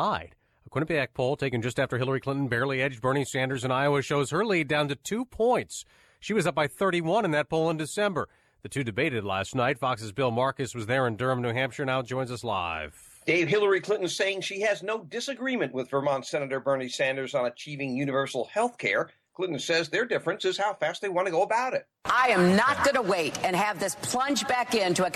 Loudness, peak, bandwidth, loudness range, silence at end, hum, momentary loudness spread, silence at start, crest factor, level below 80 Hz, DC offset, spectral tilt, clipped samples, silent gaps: -27 LUFS; -12 dBFS; 14 kHz; 4 LU; 0 s; none; 8 LU; 0 s; 14 dB; -60 dBFS; under 0.1%; -4.5 dB/octave; under 0.1%; none